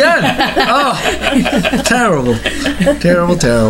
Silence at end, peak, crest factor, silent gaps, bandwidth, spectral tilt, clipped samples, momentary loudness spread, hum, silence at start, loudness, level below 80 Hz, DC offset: 0 s; 0 dBFS; 12 dB; none; 16.5 kHz; -4.5 dB/octave; under 0.1%; 3 LU; none; 0 s; -12 LUFS; -30 dBFS; under 0.1%